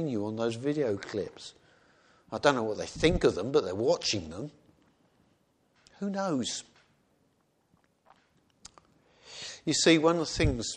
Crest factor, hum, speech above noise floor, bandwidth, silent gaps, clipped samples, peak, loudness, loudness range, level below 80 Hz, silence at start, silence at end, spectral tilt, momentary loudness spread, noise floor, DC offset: 24 dB; none; 43 dB; 10 kHz; none; under 0.1%; -8 dBFS; -29 LUFS; 9 LU; -48 dBFS; 0 s; 0 s; -4.5 dB/octave; 17 LU; -71 dBFS; under 0.1%